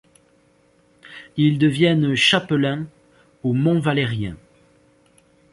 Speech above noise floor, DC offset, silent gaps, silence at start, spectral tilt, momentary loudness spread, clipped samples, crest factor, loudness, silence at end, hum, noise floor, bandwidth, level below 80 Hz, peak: 40 dB; under 0.1%; none; 1.05 s; -6 dB/octave; 16 LU; under 0.1%; 18 dB; -19 LUFS; 1.2 s; none; -58 dBFS; 11.5 kHz; -54 dBFS; -4 dBFS